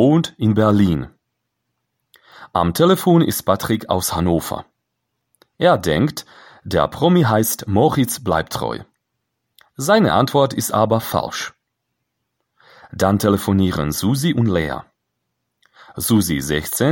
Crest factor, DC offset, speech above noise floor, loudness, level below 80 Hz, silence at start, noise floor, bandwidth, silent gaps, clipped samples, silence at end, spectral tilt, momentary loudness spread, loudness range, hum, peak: 18 dB; under 0.1%; 59 dB; -18 LUFS; -44 dBFS; 0 s; -75 dBFS; 17 kHz; none; under 0.1%; 0 s; -5.5 dB/octave; 11 LU; 3 LU; none; 0 dBFS